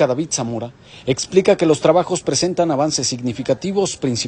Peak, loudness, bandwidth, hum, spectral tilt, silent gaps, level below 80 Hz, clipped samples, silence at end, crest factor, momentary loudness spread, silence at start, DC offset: 0 dBFS; -18 LUFS; 11 kHz; none; -4.5 dB/octave; none; -52 dBFS; under 0.1%; 0 s; 18 dB; 9 LU; 0 s; under 0.1%